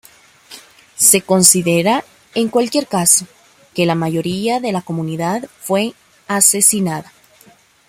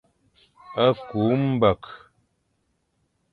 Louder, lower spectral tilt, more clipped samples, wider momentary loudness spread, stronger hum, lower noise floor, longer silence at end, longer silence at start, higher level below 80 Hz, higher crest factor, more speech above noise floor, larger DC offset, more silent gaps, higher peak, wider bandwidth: first, -14 LUFS vs -23 LUFS; second, -3 dB/octave vs -9.5 dB/octave; neither; about the same, 13 LU vs 13 LU; neither; second, -49 dBFS vs -72 dBFS; second, 0.85 s vs 1.35 s; second, 0.5 s vs 0.7 s; about the same, -58 dBFS vs -54 dBFS; about the same, 18 dB vs 20 dB; second, 34 dB vs 50 dB; neither; neither; first, 0 dBFS vs -6 dBFS; first, 17 kHz vs 4.9 kHz